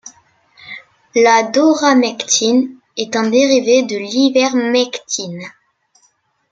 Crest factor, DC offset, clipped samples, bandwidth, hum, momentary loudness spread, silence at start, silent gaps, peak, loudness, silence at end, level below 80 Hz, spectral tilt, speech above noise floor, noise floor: 16 dB; under 0.1%; under 0.1%; 9 kHz; none; 19 LU; 0.05 s; none; 0 dBFS; -14 LUFS; 1.05 s; -66 dBFS; -2.5 dB/octave; 46 dB; -59 dBFS